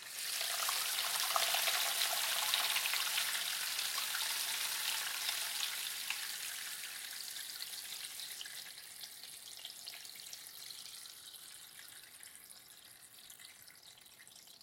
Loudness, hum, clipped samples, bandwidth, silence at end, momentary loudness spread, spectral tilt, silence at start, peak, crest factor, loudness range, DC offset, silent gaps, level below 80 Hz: -36 LUFS; none; under 0.1%; 17 kHz; 0 s; 21 LU; 3 dB/octave; 0 s; -14 dBFS; 26 dB; 17 LU; under 0.1%; none; -88 dBFS